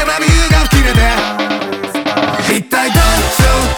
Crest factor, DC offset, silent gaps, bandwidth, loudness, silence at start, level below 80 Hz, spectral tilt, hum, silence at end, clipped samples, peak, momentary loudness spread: 12 dB; under 0.1%; none; over 20 kHz; -12 LUFS; 0 s; -16 dBFS; -4 dB/octave; none; 0 s; under 0.1%; 0 dBFS; 7 LU